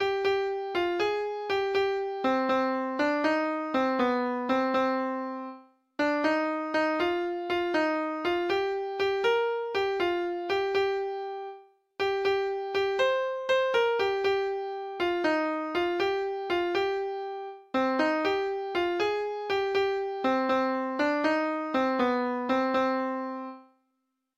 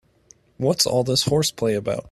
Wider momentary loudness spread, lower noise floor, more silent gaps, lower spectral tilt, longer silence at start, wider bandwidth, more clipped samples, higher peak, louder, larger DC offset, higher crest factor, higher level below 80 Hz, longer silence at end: about the same, 6 LU vs 6 LU; first, -79 dBFS vs -55 dBFS; neither; about the same, -4.5 dB/octave vs -4 dB/octave; second, 0 s vs 0.6 s; second, 8 kHz vs 15 kHz; neither; second, -12 dBFS vs -4 dBFS; second, -28 LUFS vs -21 LUFS; neither; about the same, 16 dB vs 18 dB; second, -66 dBFS vs -52 dBFS; first, 0.75 s vs 0 s